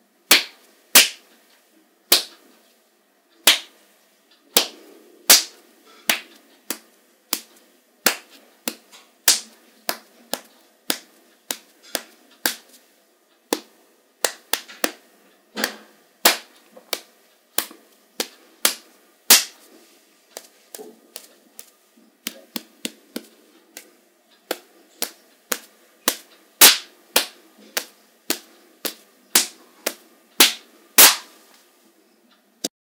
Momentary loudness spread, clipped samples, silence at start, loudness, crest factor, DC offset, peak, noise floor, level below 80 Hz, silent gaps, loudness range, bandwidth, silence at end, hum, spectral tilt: 23 LU; under 0.1%; 0.3 s; -19 LUFS; 24 dB; under 0.1%; 0 dBFS; -61 dBFS; -74 dBFS; none; 16 LU; 18 kHz; 0.25 s; none; 1.5 dB/octave